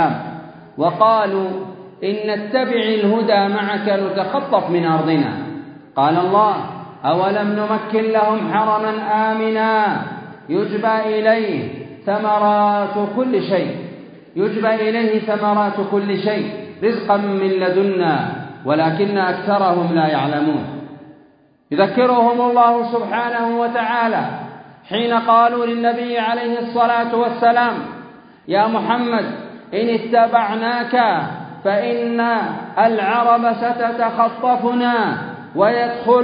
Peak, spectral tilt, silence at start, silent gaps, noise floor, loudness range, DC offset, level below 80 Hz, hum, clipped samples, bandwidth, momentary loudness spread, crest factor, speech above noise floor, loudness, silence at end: 0 dBFS; -11 dB/octave; 0 s; none; -52 dBFS; 2 LU; under 0.1%; -66 dBFS; none; under 0.1%; 5.2 kHz; 12 LU; 16 dB; 35 dB; -17 LUFS; 0 s